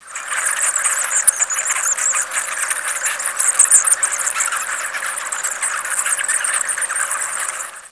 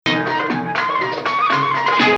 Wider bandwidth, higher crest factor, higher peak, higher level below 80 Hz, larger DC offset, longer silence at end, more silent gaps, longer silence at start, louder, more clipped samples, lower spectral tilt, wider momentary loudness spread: first, 11 kHz vs 8.2 kHz; about the same, 18 dB vs 16 dB; about the same, 0 dBFS vs -2 dBFS; second, -70 dBFS vs -60 dBFS; first, 0.1% vs under 0.1%; about the same, 0.05 s vs 0 s; neither; about the same, 0 s vs 0.05 s; about the same, -16 LUFS vs -18 LUFS; neither; second, 4 dB/octave vs -5 dB/octave; first, 10 LU vs 4 LU